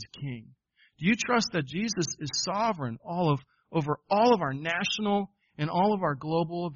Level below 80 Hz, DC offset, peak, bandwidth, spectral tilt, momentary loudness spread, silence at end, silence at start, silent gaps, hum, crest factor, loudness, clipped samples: -64 dBFS; under 0.1%; -10 dBFS; 7.2 kHz; -4 dB/octave; 10 LU; 0 s; 0 s; none; none; 18 dB; -28 LUFS; under 0.1%